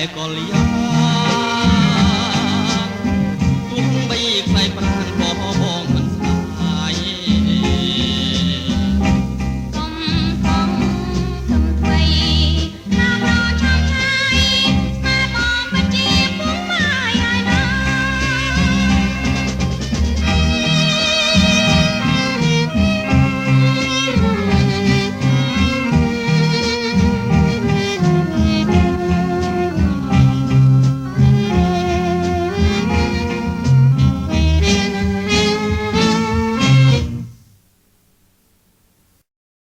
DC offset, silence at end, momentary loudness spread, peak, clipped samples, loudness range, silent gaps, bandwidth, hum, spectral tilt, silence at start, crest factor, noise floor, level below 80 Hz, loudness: under 0.1%; 2.4 s; 6 LU; 0 dBFS; under 0.1%; 3 LU; none; 12 kHz; none; -5.5 dB/octave; 0 s; 16 dB; -57 dBFS; -26 dBFS; -16 LUFS